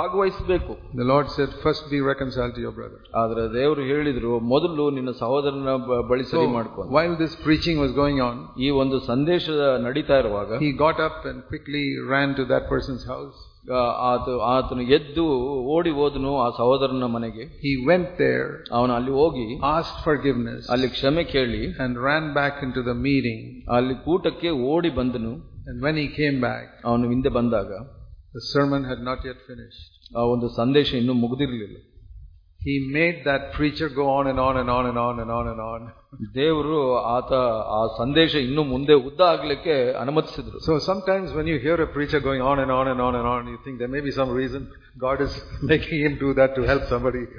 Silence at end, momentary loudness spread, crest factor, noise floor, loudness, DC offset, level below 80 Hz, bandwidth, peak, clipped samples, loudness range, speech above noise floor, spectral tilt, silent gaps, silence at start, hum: 0 s; 10 LU; 18 dB; -45 dBFS; -23 LUFS; under 0.1%; -42 dBFS; 5.2 kHz; -4 dBFS; under 0.1%; 4 LU; 22 dB; -7.5 dB/octave; none; 0 s; none